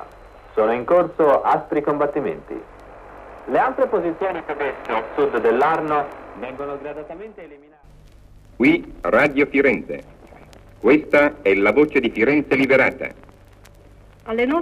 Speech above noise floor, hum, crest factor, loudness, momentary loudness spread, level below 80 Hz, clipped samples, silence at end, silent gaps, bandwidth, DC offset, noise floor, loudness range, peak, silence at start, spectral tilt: 28 dB; none; 18 dB; -19 LUFS; 17 LU; -48 dBFS; under 0.1%; 0 s; none; 12.5 kHz; under 0.1%; -47 dBFS; 6 LU; -2 dBFS; 0 s; -7 dB/octave